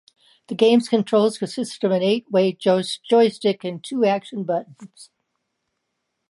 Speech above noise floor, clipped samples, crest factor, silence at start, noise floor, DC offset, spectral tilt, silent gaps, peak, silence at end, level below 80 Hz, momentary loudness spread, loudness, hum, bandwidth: 57 dB; under 0.1%; 18 dB; 0.5 s; -77 dBFS; under 0.1%; -5.5 dB/octave; none; -2 dBFS; 1.25 s; -74 dBFS; 10 LU; -20 LUFS; none; 11.5 kHz